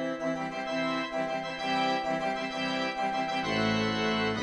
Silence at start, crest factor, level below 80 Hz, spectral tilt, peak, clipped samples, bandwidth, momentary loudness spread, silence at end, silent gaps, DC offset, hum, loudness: 0 s; 14 dB; -58 dBFS; -4.5 dB/octave; -16 dBFS; under 0.1%; 11 kHz; 5 LU; 0 s; none; under 0.1%; none; -30 LUFS